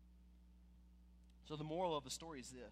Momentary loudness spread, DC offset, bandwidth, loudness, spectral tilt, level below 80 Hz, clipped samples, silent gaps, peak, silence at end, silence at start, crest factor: 25 LU; under 0.1%; 15 kHz; -46 LUFS; -4.5 dB/octave; -66 dBFS; under 0.1%; none; -30 dBFS; 0 s; 0 s; 20 dB